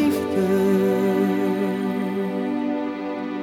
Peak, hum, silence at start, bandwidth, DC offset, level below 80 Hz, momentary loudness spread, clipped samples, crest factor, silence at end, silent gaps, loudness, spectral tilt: -8 dBFS; none; 0 s; 17 kHz; under 0.1%; -64 dBFS; 7 LU; under 0.1%; 14 dB; 0 s; none; -22 LUFS; -7 dB/octave